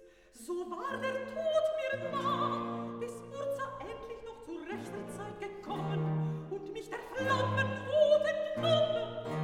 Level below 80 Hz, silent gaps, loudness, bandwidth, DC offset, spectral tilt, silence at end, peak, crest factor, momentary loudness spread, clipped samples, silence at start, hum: -66 dBFS; none; -34 LUFS; 15 kHz; under 0.1%; -6 dB/octave; 0 s; -16 dBFS; 18 dB; 14 LU; under 0.1%; 0 s; none